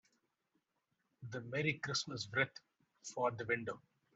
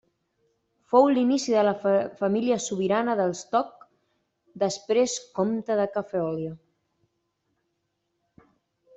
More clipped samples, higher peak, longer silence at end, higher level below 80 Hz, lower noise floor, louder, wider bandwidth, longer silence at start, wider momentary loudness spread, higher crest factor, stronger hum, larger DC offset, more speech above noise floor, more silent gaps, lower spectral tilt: neither; second, -20 dBFS vs -6 dBFS; second, 0.4 s vs 2.4 s; second, -78 dBFS vs -70 dBFS; first, -85 dBFS vs -77 dBFS; second, -39 LUFS vs -25 LUFS; about the same, 8.2 kHz vs 8.2 kHz; first, 1.2 s vs 0.9 s; first, 16 LU vs 8 LU; about the same, 22 dB vs 20 dB; neither; neither; second, 45 dB vs 53 dB; neither; about the same, -4 dB/octave vs -5 dB/octave